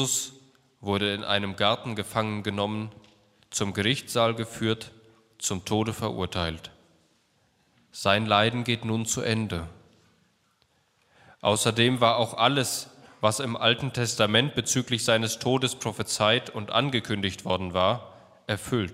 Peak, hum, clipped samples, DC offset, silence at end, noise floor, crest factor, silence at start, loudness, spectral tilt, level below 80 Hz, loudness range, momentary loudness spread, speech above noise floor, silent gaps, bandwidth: -4 dBFS; none; under 0.1%; under 0.1%; 0 s; -68 dBFS; 22 dB; 0 s; -26 LUFS; -3.5 dB/octave; -58 dBFS; 5 LU; 11 LU; 42 dB; none; 16 kHz